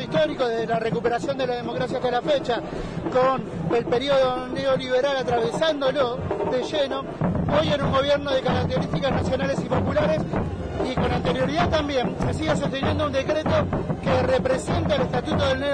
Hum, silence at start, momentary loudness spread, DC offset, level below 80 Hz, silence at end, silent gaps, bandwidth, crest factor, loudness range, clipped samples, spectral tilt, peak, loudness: none; 0 s; 5 LU; under 0.1%; -40 dBFS; 0 s; none; 10 kHz; 14 dB; 1 LU; under 0.1%; -6 dB/octave; -8 dBFS; -23 LUFS